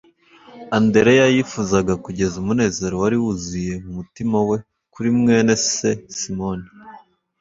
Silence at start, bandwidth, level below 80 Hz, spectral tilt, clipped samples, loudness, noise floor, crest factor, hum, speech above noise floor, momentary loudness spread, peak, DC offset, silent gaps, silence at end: 0.55 s; 7.8 kHz; -46 dBFS; -5 dB/octave; under 0.1%; -19 LUFS; -48 dBFS; 18 dB; none; 30 dB; 12 LU; -2 dBFS; under 0.1%; none; 0.4 s